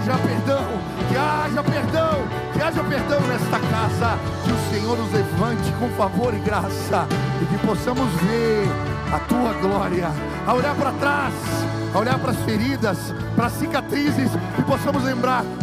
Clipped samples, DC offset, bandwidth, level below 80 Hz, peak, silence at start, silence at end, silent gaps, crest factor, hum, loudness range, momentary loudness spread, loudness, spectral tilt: under 0.1%; under 0.1%; 15.5 kHz; -42 dBFS; -8 dBFS; 0 s; 0 s; none; 14 dB; none; 1 LU; 3 LU; -22 LUFS; -6.5 dB/octave